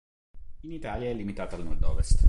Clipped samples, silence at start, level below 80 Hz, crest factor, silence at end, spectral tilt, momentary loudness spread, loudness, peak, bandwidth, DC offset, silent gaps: under 0.1%; 0.35 s; -30 dBFS; 18 dB; 0 s; -6.5 dB/octave; 10 LU; -34 LUFS; -6 dBFS; 11 kHz; under 0.1%; none